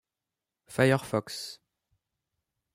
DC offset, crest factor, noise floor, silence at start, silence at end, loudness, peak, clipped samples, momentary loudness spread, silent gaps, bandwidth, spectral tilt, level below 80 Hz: under 0.1%; 24 dB; -89 dBFS; 0.7 s; 1.2 s; -29 LUFS; -10 dBFS; under 0.1%; 14 LU; none; 16 kHz; -5.5 dB/octave; -68 dBFS